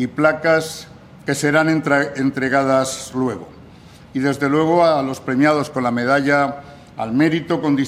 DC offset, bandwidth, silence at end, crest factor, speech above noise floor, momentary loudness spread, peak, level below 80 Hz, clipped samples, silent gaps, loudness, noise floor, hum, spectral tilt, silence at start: under 0.1%; 15.5 kHz; 0 s; 18 dB; 25 dB; 13 LU; 0 dBFS; -56 dBFS; under 0.1%; none; -18 LUFS; -42 dBFS; none; -5.5 dB/octave; 0 s